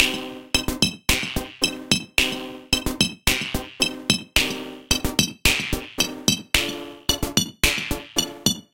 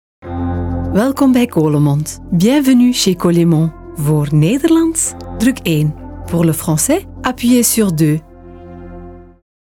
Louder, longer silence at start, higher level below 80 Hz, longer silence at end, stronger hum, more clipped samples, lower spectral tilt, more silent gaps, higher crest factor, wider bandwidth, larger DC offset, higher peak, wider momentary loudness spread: second, -22 LUFS vs -14 LUFS; second, 0 s vs 0.25 s; about the same, -36 dBFS vs -36 dBFS; second, 0.1 s vs 0.55 s; neither; neither; second, -2 dB/octave vs -5.5 dB/octave; neither; first, 24 dB vs 12 dB; about the same, 17 kHz vs 18.5 kHz; first, 0.3% vs under 0.1%; about the same, 0 dBFS vs -2 dBFS; second, 6 LU vs 10 LU